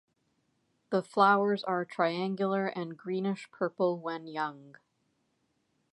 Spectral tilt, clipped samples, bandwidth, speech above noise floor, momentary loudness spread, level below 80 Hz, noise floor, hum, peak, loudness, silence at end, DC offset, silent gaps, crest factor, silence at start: -7 dB/octave; under 0.1%; 11.5 kHz; 46 dB; 12 LU; -86 dBFS; -76 dBFS; none; -10 dBFS; -31 LUFS; 1.25 s; under 0.1%; none; 22 dB; 0.9 s